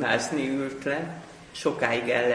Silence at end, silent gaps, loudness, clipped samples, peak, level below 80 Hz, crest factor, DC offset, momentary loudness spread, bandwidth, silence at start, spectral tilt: 0 s; none; -27 LUFS; under 0.1%; -6 dBFS; -62 dBFS; 20 dB; under 0.1%; 14 LU; 10.5 kHz; 0 s; -4.5 dB/octave